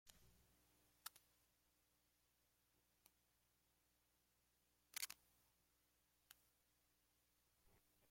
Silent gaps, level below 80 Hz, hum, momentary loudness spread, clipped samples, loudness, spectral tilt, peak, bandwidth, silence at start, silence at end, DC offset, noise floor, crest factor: none; -88 dBFS; 60 Hz at -90 dBFS; 9 LU; under 0.1%; -55 LUFS; 1 dB/octave; -32 dBFS; 16.5 kHz; 0.05 s; 0 s; under 0.1%; -84 dBFS; 34 dB